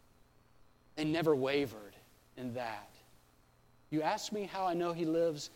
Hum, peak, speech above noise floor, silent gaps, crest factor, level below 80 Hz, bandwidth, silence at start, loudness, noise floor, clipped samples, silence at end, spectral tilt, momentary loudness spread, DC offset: none; -18 dBFS; 32 dB; none; 20 dB; -70 dBFS; 16.5 kHz; 0.95 s; -35 LUFS; -66 dBFS; under 0.1%; 0.05 s; -5.5 dB/octave; 16 LU; under 0.1%